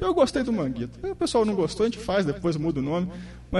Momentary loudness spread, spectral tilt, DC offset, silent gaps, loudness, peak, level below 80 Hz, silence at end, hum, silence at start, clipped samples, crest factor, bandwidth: 9 LU; -6 dB/octave; under 0.1%; none; -26 LUFS; -8 dBFS; -44 dBFS; 0 s; 60 Hz at -45 dBFS; 0 s; under 0.1%; 18 dB; 11.5 kHz